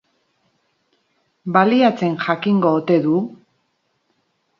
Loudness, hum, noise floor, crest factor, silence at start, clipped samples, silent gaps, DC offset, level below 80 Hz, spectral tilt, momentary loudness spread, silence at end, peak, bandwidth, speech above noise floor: -17 LUFS; none; -68 dBFS; 20 dB; 1.45 s; under 0.1%; none; under 0.1%; -70 dBFS; -8 dB/octave; 7 LU; 1.25 s; 0 dBFS; 7 kHz; 52 dB